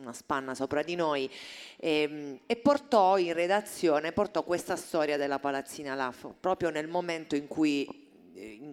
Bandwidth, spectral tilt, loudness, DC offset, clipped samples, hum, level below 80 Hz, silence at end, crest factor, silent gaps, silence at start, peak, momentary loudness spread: 16.5 kHz; -4.5 dB/octave; -30 LUFS; under 0.1%; under 0.1%; none; -66 dBFS; 0 s; 20 dB; none; 0 s; -10 dBFS; 12 LU